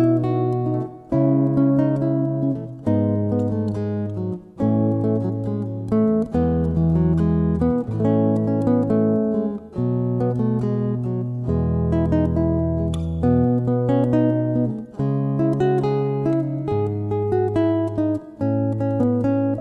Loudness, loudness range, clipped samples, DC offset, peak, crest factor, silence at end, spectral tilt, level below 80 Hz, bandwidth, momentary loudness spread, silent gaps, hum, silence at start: -21 LUFS; 2 LU; under 0.1%; under 0.1%; -6 dBFS; 14 dB; 0 s; -11 dB/octave; -38 dBFS; 7.2 kHz; 6 LU; none; none; 0 s